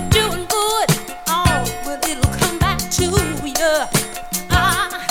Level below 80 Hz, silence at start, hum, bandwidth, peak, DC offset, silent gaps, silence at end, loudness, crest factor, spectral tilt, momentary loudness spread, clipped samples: -30 dBFS; 0 s; none; 18.5 kHz; -2 dBFS; under 0.1%; none; 0 s; -18 LUFS; 16 dB; -3.5 dB/octave; 5 LU; under 0.1%